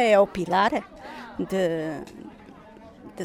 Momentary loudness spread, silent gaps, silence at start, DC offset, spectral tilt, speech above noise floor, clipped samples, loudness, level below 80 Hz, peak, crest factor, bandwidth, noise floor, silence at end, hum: 23 LU; none; 0 s; under 0.1%; -5.5 dB/octave; 24 dB; under 0.1%; -24 LUFS; -56 dBFS; -6 dBFS; 18 dB; 14.5 kHz; -47 dBFS; 0 s; none